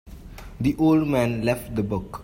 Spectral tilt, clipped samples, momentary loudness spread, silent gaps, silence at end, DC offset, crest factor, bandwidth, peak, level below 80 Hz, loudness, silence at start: -7.5 dB/octave; under 0.1%; 23 LU; none; 0 s; under 0.1%; 14 dB; 16 kHz; -8 dBFS; -42 dBFS; -23 LUFS; 0.05 s